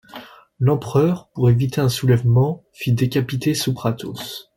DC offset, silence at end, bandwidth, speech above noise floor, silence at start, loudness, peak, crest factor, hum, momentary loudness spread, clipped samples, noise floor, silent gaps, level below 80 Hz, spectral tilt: under 0.1%; 0.15 s; 16.5 kHz; 22 dB; 0.15 s; -20 LUFS; -4 dBFS; 16 dB; none; 11 LU; under 0.1%; -40 dBFS; none; -50 dBFS; -6.5 dB/octave